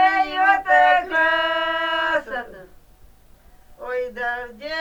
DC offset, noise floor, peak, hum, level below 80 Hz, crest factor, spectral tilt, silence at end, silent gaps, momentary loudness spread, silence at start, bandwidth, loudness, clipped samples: under 0.1%; -49 dBFS; -4 dBFS; none; -52 dBFS; 18 dB; -3 dB/octave; 0 s; none; 15 LU; 0 s; 19.5 kHz; -20 LUFS; under 0.1%